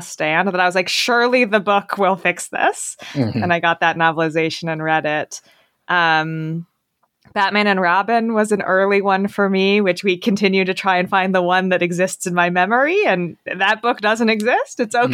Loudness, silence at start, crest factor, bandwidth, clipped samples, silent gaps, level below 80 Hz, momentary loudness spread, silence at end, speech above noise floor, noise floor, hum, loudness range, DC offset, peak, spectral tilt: -17 LUFS; 0 s; 16 dB; 16 kHz; under 0.1%; none; -70 dBFS; 6 LU; 0 s; 50 dB; -68 dBFS; none; 3 LU; under 0.1%; 0 dBFS; -4.5 dB/octave